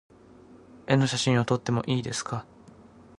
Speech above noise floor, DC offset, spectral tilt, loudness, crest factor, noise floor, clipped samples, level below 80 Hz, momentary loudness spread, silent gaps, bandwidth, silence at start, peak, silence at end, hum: 26 dB; under 0.1%; -5 dB/octave; -26 LUFS; 22 dB; -52 dBFS; under 0.1%; -60 dBFS; 12 LU; none; 11.5 kHz; 0.5 s; -8 dBFS; 0.5 s; none